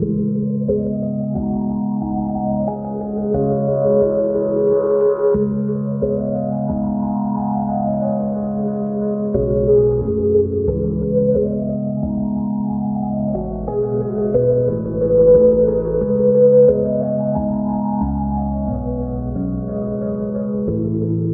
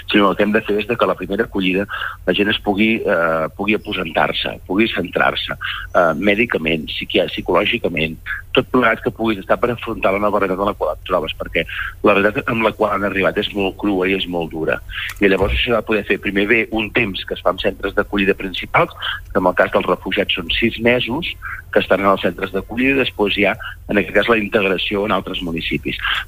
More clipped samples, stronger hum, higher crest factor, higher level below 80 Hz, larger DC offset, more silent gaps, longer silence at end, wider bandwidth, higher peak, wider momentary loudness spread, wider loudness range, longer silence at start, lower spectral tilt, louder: neither; neither; about the same, 16 dB vs 16 dB; about the same, -34 dBFS vs -38 dBFS; neither; neither; about the same, 0 s vs 0 s; second, 1.8 kHz vs 16 kHz; about the same, -2 dBFS vs -2 dBFS; about the same, 8 LU vs 6 LU; first, 6 LU vs 1 LU; about the same, 0 s vs 0 s; first, -16 dB/octave vs -6 dB/octave; about the same, -18 LUFS vs -18 LUFS